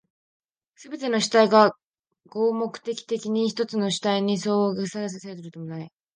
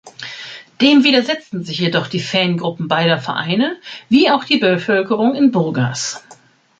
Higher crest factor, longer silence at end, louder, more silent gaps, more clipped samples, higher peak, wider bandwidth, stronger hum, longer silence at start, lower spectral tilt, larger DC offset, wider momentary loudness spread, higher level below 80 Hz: about the same, 20 dB vs 16 dB; second, 0.25 s vs 0.45 s; second, -23 LUFS vs -16 LUFS; first, 1.85-1.93 s vs none; neither; second, -4 dBFS vs 0 dBFS; about the same, 9.8 kHz vs 9 kHz; neither; first, 0.8 s vs 0.05 s; about the same, -4.5 dB/octave vs -5 dB/octave; neither; first, 19 LU vs 16 LU; second, -74 dBFS vs -60 dBFS